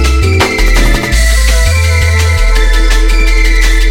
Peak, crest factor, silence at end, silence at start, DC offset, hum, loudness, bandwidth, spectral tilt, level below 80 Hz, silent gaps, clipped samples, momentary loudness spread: 0 dBFS; 6 dB; 0 s; 0 s; under 0.1%; none; -10 LUFS; 16.5 kHz; -4 dB/octave; -8 dBFS; none; 0.3%; 1 LU